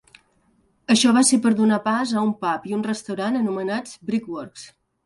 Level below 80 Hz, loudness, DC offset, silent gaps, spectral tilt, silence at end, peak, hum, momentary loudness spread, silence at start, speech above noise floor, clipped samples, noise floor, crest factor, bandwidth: -64 dBFS; -21 LUFS; under 0.1%; none; -3.5 dB/octave; 0.4 s; -4 dBFS; none; 17 LU; 0.9 s; 42 dB; under 0.1%; -63 dBFS; 18 dB; 11.5 kHz